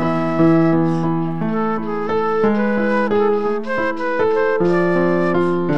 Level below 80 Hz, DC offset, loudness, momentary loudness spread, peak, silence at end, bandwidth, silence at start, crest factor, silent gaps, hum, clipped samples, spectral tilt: -52 dBFS; 4%; -17 LUFS; 6 LU; -4 dBFS; 0 s; 7.4 kHz; 0 s; 12 dB; none; none; under 0.1%; -8.5 dB/octave